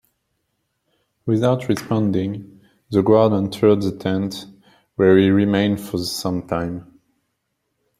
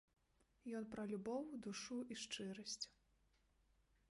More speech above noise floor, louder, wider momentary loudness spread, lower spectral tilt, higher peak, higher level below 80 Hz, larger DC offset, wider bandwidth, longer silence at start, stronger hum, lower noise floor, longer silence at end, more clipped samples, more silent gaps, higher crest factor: first, 56 dB vs 30 dB; first, -19 LUFS vs -49 LUFS; first, 14 LU vs 5 LU; first, -7 dB/octave vs -3.5 dB/octave; first, -2 dBFS vs -34 dBFS; first, -56 dBFS vs -80 dBFS; neither; first, 16 kHz vs 11.5 kHz; first, 1.25 s vs 0.65 s; neither; second, -74 dBFS vs -79 dBFS; about the same, 1.15 s vs 1.25 s; neither; neither; about the same, 18 dB vs 18 dB